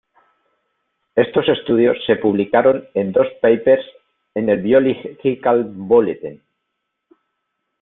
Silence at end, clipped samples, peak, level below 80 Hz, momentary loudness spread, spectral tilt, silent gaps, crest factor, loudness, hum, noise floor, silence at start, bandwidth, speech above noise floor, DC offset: 1.5 s; under 0.1%; -2 dBFS; -58 dBFS; 8 LU; -11 dB/octave; none; 16 dB; -17 LUFS; none; -76 dBFS; 1.15 s; 4 kHz; 60 dB; under 0.1%